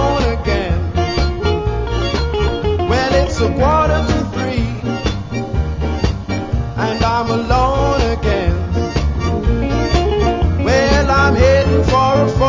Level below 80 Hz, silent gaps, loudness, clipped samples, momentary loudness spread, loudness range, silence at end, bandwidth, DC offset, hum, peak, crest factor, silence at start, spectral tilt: -20 dBFS; none; -16 LUFS; under 0.1%; 7 LU; 4 LU; 0 s; 7.6 kHz; under 0.1%; none; 0 dBFS; 14 dB; 0 s; -6.5 dB/octave